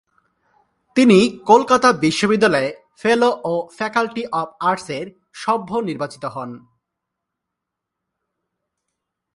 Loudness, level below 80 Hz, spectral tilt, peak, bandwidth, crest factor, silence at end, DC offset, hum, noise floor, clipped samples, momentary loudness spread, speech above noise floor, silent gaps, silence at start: -18 LUFS; -60 dBFS; -5 dB/octave; 0 dBFS; 11.5 kHz; 20 dB; 2.8 s; under 0.1%; none; -82 dBFS; under 0.1%; 16 LU; 64 dB; none; 0.95 s